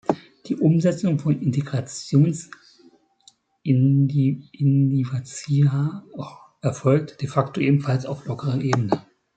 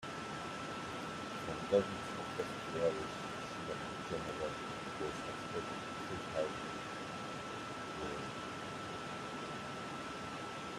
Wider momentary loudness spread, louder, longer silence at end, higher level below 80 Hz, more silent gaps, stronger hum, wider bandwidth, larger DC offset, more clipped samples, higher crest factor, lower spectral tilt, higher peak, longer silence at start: first, 12 LU vs 7 LU; first, -22 LUFS vs -41 LUFS; first, 0.35 s vs 0 s; about the same, -62 dBFS vs -66 dBFS; neither; neither; second, 9 kHz vs 14.5 kHz; neither; neither; about the same, 20 dB vs 24 dB; first, -7.5 dB/octave vs -4.5 dB/octave; first, -2 dBFS vs -18 dBFS; about the same, 0.1 s vs 0 s